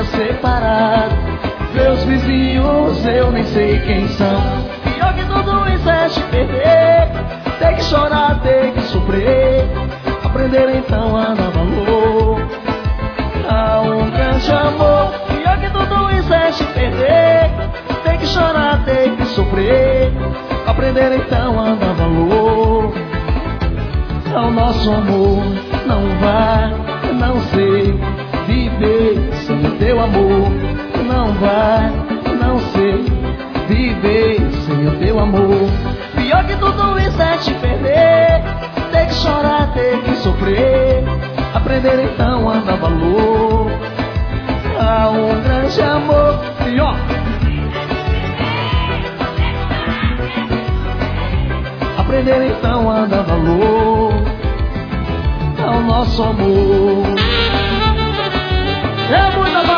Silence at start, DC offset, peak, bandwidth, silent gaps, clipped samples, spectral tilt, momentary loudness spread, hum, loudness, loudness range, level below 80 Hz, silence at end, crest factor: 0 s; under 0.1%; 0 dBFS; 5.4 kHz; none; under 0.1%; -7.5 dB/octave; 7 LU; none; -15 LUFS; 2 LU; -22 dBFS; 0 s; 14 dB